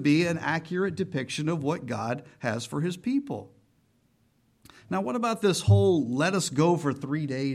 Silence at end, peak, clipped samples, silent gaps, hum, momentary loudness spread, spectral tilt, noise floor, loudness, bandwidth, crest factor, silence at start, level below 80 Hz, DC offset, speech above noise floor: 0 s; -8 dBFS; under 0.1%; none; none; 10 LU; -6 dB/octave; -67 dBFS; -27 LUFS; 13.5 kHz; 18 dB; 0 s; -60 dBFS; under 0.1%; 41 dB